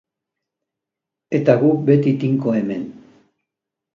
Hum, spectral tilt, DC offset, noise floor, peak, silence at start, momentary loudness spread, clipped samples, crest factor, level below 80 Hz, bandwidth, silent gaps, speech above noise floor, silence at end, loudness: none; -9.5 dB/octave; under 0.1%; -85 dBFS; 0 dBFS; 1.3 s; 11 LU; under 0.1%; 20 dB; -64 dBFS; 7 kHz; none; 68 dB; 1 s; -18 LUFS